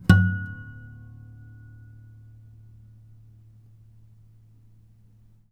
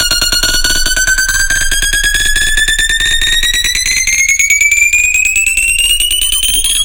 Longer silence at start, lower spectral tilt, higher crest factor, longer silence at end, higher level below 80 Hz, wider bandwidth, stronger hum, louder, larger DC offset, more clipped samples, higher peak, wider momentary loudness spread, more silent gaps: about the same, 0.1 s vs 0 s; first, -7 dB/octave vs 1.5 dB/octave; first, 28 dB vs 10 dB; first, 4.7 s vs 0 s; second, -46 dBFS vs -20 dBFS; second, 11 kHz vs 17.5 kHz; neither; second, -24 LUFS vs -8 LUFS; neither; neither; about the same, 0 dBFS vs 0 dBFS; first, 28 LU vs 3 LU; neither